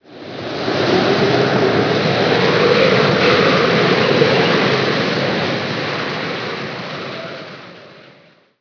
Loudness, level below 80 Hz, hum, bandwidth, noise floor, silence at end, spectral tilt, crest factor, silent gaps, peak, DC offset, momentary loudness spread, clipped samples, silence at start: -15 LUFS; -54 dBFS; none; 5.4 kHz; -49 dBFS; 0.7 s; -5.5 dB/octave; 16 dB; none; 0 dBFS; under 0.1%; 14 LU; under 0.1%; 0.1 s